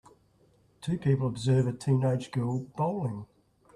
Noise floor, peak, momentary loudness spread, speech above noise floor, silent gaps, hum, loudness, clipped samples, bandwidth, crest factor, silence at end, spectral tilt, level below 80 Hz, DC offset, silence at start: -64 dBFS; -14 dBFS; 9 LU; 36 dB; none; none; -29 LUFS; under 0.1%; 11 kHz; 16 dB; 0.5 s; -8 dB/octave; -62 dBFS; under 0.1%; 0.8 s